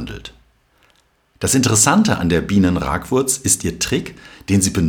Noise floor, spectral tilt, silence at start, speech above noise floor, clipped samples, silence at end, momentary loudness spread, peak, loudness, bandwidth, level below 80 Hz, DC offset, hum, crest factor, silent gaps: -58 dBFS; -4 dB/octave; 0 s; 42 dB; under 0.1%; 0 s; 15 LU; 0 dBFS; -16 LUFS; 19.5 kHz; -38 dBFS; under 0.1%; none; 18 dB; none